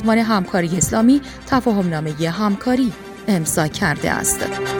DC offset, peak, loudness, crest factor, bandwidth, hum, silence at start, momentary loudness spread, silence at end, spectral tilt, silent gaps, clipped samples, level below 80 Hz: under 0.1%; -2 dBFS; -18 LUFS; 16 dB; over 20 kHz; none; 0 s; 6 LU; 0 s; -4.5 dB/octave; none; under 0.1%; -42 dBFS